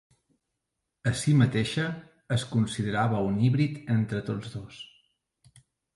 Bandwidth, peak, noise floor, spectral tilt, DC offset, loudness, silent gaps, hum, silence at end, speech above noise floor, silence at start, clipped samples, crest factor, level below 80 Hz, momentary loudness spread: 11.5 kHz; -10 dBFS; -83 dBFS; -6.5 dB/octave; under 0.1%; -27 LUFS; none; none; 1.1 s; 57 dB; 1.05 s; under 0.1%; 20 dB; -56 dBFS; 17 LU